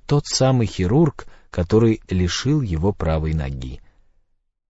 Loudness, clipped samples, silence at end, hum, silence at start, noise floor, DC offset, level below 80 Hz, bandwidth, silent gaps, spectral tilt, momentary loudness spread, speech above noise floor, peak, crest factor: -20 LUFS; under 0.1%; 0.9 s; none; 0.1 s; -66 dBFS; under 0.1%; -34 dBFS; 8 kHz; none; -6 dB/octave; 11 LU; 46 dB; -4 dBFS; 16 dB